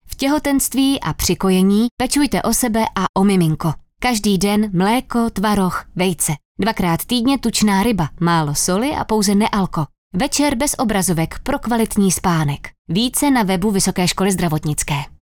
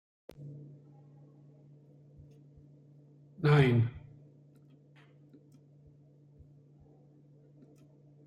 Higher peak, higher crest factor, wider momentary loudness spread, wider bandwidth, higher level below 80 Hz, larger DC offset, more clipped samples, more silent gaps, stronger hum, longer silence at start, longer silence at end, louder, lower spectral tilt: first, -6 dBFS vs -12 dBFS; second, 12 dB vs 24 dB; second, 6 LU vs 32 LU; first, 19.5 kHz vs 7.2 kHz; first, -36 dBFS vs -66 dBFS; neither; neither; first, 1.91-1.97 s, 3.09-3.14 s, 6.45-6.55 s, 9.98-10.11 s, 12.78-12.85 s vs none; neither; second, 0.05 s vs 0.4 s; second, 0.15 s vs 4.25 s; first, -17 LUFS vs -28 LUFS; second, -4.5 dB/octave vs -8.5 dB/octave